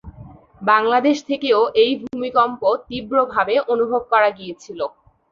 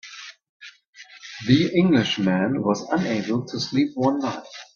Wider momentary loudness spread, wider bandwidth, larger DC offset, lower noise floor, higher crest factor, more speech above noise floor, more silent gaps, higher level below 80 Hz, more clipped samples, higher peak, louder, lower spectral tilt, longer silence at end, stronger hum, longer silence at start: second, 13 LU vs 20 LU; about the same, 7.2 kHz vs 7.2 kHz; neither; second, -42 dBFS vs -48 dBFS; about the same, 18 dB vs 20 dB; about the same, 24 dB vs 27 dB; second, none vs 0.49-0.60 s, 0.87-0.93 s; first, -54 dBFS vs -60 dBFS; neither; about the same, -2 dBFS vs -2 dBFS; first, -18 LUFS vs -22 LUFS; second, -4.5 dB/octave vs -6 dB/octave; first, 0.45 s vs 0.1 s; neither; about the same, 0.05 s vs 0.05 s